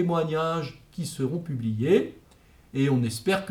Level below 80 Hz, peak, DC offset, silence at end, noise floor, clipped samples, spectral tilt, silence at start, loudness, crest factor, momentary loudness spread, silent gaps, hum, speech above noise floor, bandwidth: -58 dBFS; -8 dBFS; under 0.1%; 0 s; -56 dBFS; under 0.1%; -6.5 dB/octave; 0 s; -27 LUFS; 18 dB; 12 LU; none; none; 30 dB; 17.5 kHz